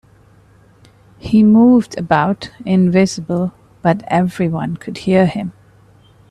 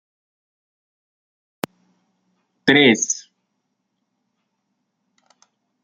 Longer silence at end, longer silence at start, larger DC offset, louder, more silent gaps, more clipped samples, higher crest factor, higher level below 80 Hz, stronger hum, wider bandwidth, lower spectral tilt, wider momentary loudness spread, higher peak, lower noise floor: second, 0.8 s vs 2.65 s; second, 1.25 s vs 2.65 s; neither; about the same, -15 LUFS vs -16 LUFS; neither; neither; second, 16 dB vs 24 dB; first, -48 dBFS vs -66 dBFS; neither; second, 11 kHz vs 13 kHz; first, -7 dB/octave vs -2.5 dB/octave; second, 14 LU vs 20 LU; about the same, 0 dBFS vs -2 dBFS; second, -48 dBFS vs -75 dBFS